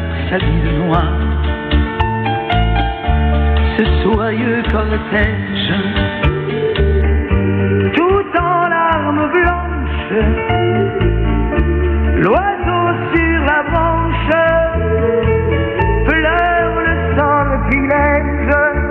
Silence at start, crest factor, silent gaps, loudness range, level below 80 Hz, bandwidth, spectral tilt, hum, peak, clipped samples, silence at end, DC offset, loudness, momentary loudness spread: 0 s; 12 dB; none; 2 LU; -20 dBFS; 4.4 kHz; -9.5 dB/octave; none; -2 dBFS; under 0.1%; 0 s; under 0.1%; -15 LUFS; 4 LU